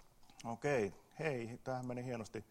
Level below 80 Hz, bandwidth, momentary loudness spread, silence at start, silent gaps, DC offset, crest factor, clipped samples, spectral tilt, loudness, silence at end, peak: -70 dBFS; 16 kHz; 9 LU; 0 s; none; under 0.1%; 20 dB; under 0.1%; -6 dB/octave; -42 LUFS; 0.1 s; -22 dBFS